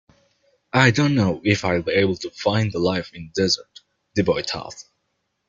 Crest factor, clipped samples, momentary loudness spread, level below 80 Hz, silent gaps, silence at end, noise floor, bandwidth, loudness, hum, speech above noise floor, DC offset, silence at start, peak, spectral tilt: 20 dB; under 0.1%; 11 LU; -54 dBFS; none; 0.65 s; -74 dBFS; 7.8 kHz; -21 LUFS; none; 53 dB; under 0.1%; 0.75 s; -2 dBFS; -5.5 dB/octave